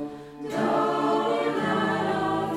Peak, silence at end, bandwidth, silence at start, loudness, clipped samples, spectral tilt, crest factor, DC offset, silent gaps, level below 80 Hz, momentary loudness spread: -12 dBFS; 0 s; 15.5 kHz; 0 s; -25 LUFS; under 0.1%; -6 dB/octave; 14 dB; under 0.1%; none; -60 dBFS; 8 LU